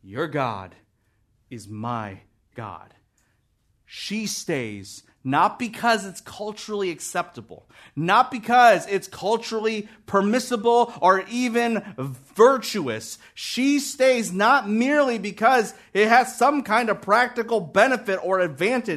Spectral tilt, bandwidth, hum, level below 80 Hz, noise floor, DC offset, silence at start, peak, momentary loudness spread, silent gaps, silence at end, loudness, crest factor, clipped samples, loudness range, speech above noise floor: -4 dB/octave; 13.5 kHz; none; -66 dBFS; -67 dBFS; under 0.1%; 0.05 s; -2 dBFS; 17 LU; none; 0 s; -21 LUFS; 20 dB; under 0.1%; 13 LU; 45 dB